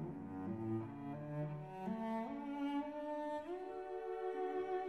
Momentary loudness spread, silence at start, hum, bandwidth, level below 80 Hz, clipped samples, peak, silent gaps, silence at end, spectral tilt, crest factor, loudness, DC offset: 5 LU; 0 s; none; 12 kHz; -74 dBFS; under 0.1%; -30 dBFS; none; 0 s; -8.5 dB/octave; 12 dB; -44 LUFS; under 0.1%